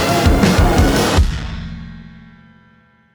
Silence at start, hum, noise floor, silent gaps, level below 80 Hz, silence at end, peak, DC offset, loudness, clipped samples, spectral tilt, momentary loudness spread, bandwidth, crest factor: 0 s; none; -51 dBFS; none; -20 dBFS; 0.95 s; 0 dBFS; under 0.1%; -14 LUFS; under 0.1%; -5.5 dB/octave; 18 LU; over 20 kHz; 14 dB